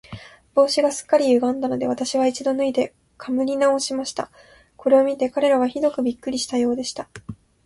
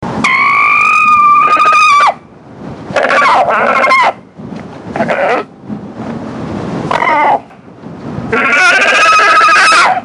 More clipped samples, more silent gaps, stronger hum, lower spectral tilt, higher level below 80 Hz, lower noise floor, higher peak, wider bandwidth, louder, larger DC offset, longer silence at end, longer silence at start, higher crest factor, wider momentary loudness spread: neither; neither; neither; about the same, -4 dB/octave vs -3 dB/octave; second, -60 dBFS vs -46 dBFS; first, -41 dBFS vs -32 dBFS; second, -4 dBFS vs 0 dBFS; about the same, 11.5 kHz vs 11.5 kHz; second, -21 LUFS vs -7 LUFS; neither; first, 0.3 s vs 0 s; about the same, 0.1 s vs 0 s; first, 18 dB vs 10 dB; second, 16 LU vs 20 LU